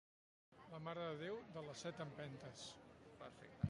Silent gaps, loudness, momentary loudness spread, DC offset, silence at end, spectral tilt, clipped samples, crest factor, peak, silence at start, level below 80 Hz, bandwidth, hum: none; -52 LUFS; 12 LU; under 0.1%; 0 s; -5.5 dB/octave; under 0.1%; 24 dB; -26 dBFS; 0.5 s; -70 dBFS; 11 kHz; none